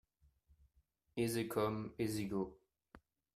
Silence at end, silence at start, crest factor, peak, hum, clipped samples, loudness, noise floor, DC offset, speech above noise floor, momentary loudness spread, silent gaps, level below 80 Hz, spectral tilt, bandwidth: 0.4 s; 1.15 s; 22 dB; -22 dBFS; none; under 0.1%; -40 LUFS; -78 dBFS; under 0.1%; 39 dB; 7 LU; none; -68 dBFS; -5.5 dB/octave; 15.5 kHz